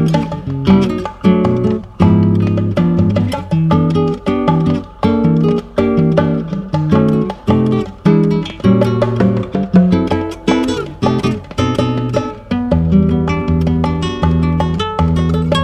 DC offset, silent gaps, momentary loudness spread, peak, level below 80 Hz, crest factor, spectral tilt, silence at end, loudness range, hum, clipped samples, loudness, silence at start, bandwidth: under 0.1%; none; 6 LU; 0 dBFS; -30 dBFS; 14 dB; -8 dB/octave; 0 s; 2 LU; none; under 0.1%; -14 LUFS; 0 s; 10 kHz